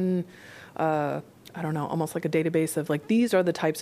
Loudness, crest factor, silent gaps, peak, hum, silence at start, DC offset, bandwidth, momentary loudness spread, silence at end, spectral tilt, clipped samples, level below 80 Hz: -27 LUFS; 16 dB; none; -12 dBFS; none; 0 s; under 0.1%; 15.5 kHz; 15 LU; 0 s; -6 dB/octave; under 0.1%; -70 dBFS